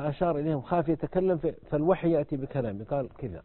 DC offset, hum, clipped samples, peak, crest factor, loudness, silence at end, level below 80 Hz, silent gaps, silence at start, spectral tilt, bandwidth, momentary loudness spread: under 0.1%; none; under 0.1%; -12 dBFS; 18 dB; -29 LUFS; 0.05 s; -52 dBFS; none; 0 s; -12.5 dB/octave; 4.3 kHz; 7 LU